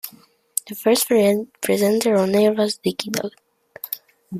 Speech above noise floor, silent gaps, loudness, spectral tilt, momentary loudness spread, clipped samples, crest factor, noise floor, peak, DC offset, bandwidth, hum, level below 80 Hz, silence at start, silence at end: 31 dB; none; -20 LUFS; -4 dB/octave; 14 LU; under 0.1%; 20 dB; -50 dBFS; 0 dBFS; under 0.1%; 15.5 kHz; none; -66 dBFS; 0.05 s; 0 s